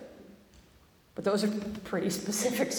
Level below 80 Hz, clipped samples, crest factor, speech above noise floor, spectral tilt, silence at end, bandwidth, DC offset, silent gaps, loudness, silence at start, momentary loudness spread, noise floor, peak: -62 dBFS; under 0.1%; 18 dB; 30 dB; -4 dB/octave; 0 s; over 20 kHz; under 0.1%; none; -31 LUFS; 0 s; 11 LU; -61 dBFS; -16 dBFS